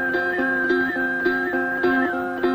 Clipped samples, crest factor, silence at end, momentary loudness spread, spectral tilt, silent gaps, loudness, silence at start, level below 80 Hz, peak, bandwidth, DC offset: under 0.1%; 12 dB; 0 s; 3 LU; -6 dB/octave; none; -21 LUFS; 0 s; -56 dBFS; -10 dBFS; 15.5 kHz; under 0.1%